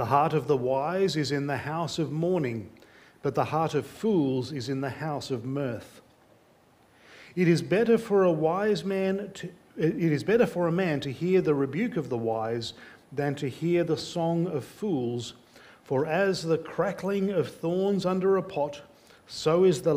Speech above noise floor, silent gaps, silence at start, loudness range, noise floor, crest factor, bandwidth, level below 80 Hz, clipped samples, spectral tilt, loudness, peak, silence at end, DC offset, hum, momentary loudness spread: 34 dB; none; 0 s; 4 LU; -60 dBFS; 18 dB; 16 kHz; -64 dBFS; under 0.1%; -6.5 dB/octave; -27 LUFS; -8 dBFS; 0 s; under 0.1%; none; 10 LU